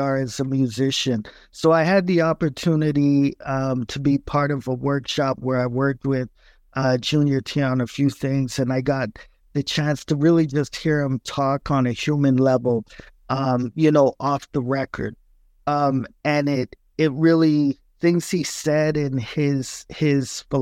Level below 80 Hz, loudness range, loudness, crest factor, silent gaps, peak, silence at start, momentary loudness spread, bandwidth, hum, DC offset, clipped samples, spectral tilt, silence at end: -50 dBFS; 2 LU; -21 LUFS; 16 dB; none; -4 dBFS; 0 s; 8 LU; 15 kHz; none; under 0.1%; under 0.1%; -6.5 dB/octave; 0 s